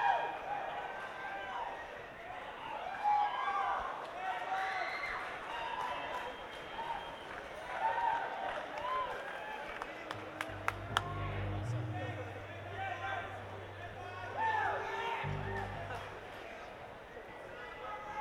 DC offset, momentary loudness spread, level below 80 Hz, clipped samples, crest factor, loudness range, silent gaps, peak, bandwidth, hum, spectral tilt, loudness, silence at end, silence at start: under 0.1%; 12 LU; -60 dBFS; under 0.1%; 30 dB; 3 LU; none; -10 dBFS; 17 kHz; none; -5 dB/octave; -39 LUFS; 0 s; 0 s